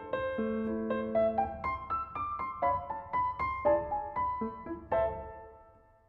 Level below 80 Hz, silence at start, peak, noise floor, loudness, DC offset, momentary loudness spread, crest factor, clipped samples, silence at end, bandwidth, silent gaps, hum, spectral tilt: -54 dBFS; 0 s; -16 dBFS; -60 dBFS; -33 LUFS; under 0.1%; 8 LU; 18 dB; under 0.1%; 0.35 s; 5.6 kHz; none; none; -9.5 dB/octave